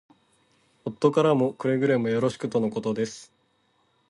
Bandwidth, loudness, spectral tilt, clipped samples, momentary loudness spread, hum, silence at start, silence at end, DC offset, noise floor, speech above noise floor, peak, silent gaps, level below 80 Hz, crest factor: 11 kHz; -25 LUFS; -6.5 dB/octave; under 0.1%; 13 LU; none; 0.85 s; 0.85 s; under 0.1%; -68 dBFS; 44 dB; -6 dBFS; none; -68 dBFS; 20 dB